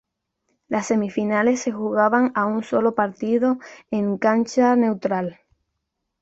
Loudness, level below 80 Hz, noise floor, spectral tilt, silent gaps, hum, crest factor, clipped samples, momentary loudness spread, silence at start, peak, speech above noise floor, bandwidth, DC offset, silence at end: -21 LUFS; -66 dBFS; -78 dBFS; -6 dB/octave; none; none; 18 dB; under 0.1%; 8 LU; 0.7 s; -4 dBFS; 58 dB; 8 kHz; under 0.1%; 0.9 s